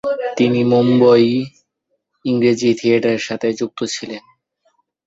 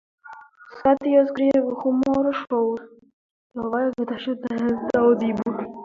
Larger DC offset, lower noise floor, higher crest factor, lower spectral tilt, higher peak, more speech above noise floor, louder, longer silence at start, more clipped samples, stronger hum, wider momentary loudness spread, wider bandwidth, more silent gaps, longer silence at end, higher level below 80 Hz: neither; first, -71 dBFS vs -44 dBFS; about the same, 16 dB vs 18 dB; second, -6 dB/octave vs -7.5 dB/octave; first, -2 dBFS vs -6 dBFS; first, 56 dB vs 23 dB; first, -16 LUFS vs -22 LUFS; second, 0.05 s vs 0.25 s; neither; neither; first, 15 LU vs 9 LU; about the same, 7.8 kHz vs 7.2 kHz; second, none vs 3.13-3.50 s; first, 0.9 s vs 0 s; about the same, -60 dBFS vs -58 dBFS